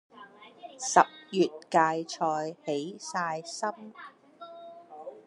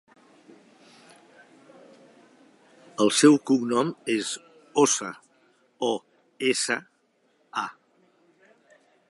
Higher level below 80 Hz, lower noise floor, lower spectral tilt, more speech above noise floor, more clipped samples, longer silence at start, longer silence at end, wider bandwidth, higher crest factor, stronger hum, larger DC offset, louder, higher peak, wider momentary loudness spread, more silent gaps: about the same, -86 dBFS vs -82 dBFS; second, -51 dBFS vs -67 dBFS; about the same, -3.5 dB/octave vs -3.5 dB/octave; second, 23 dB vs 45 dB; neither; second, 0.15 s vs 3 s; second, 0.05 s vs 1.4 s; about the same, 11.5 kHz vs 11.5 kHz; about the same, 26 dB vs 22 dB; neither; neither; second, -29 LUFS vs -24 LUFS; about the same, -4 dBFS vs -4 dBFS; first, 24 LU vs 18 LU; neither